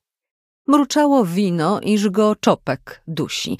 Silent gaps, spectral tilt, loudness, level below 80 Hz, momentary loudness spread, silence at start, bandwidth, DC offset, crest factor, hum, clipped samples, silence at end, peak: none; -5.5 dB/octave; -18 LUFS; -60 dBFS; 11 LU; 0.7 s; 15.5 kHz; under 0.1%; 18 dB; none; under 0.1%; 0.05 s; -2 dBFS